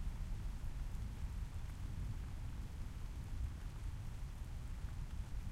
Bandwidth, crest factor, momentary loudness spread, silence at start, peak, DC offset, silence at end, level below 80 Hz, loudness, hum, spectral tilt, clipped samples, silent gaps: 15 kHz; 12 dB; 3 LU; 0 s; -32 dBFS; under 0.1%; 0 s; -46 dBFS; -48 LUFS; none; -6 dB/octave; under 0.1%; none